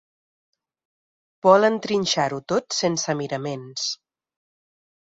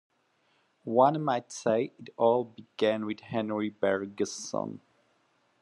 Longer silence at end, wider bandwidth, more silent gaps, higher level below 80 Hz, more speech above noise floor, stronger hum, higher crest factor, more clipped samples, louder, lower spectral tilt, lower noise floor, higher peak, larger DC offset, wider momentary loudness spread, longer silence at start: first, 1.15 s vs 0.85 s; second, 7.8 kHz vs 11.5 kHz; neither; first, -66 dBFS vs -78 dBFS; first, over 68 dB vs 42 dB; neither; about the same, 24 dB vs 22 dB; neither; first, -22 LUFS vs -29 LUFS; second, -3.5 dB/octave vs -5 dB/octave; first, under -90 dBFS vs -71 dBFS; first, -2 dBFS vs -10 dBFS; neither; about the same, 12 LU vs 12 LU; first, 1.45 s vs 0.85 s